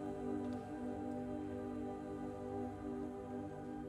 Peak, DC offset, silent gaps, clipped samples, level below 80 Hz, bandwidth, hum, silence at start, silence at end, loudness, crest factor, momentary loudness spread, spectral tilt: -32 dBFS; under 0.1%; none; under 0.1%; -62 dBFS; 12 kHz; none; 0 s; 0 s; -45 LUFS; 12 dB; 3 LU; -8 dB/octave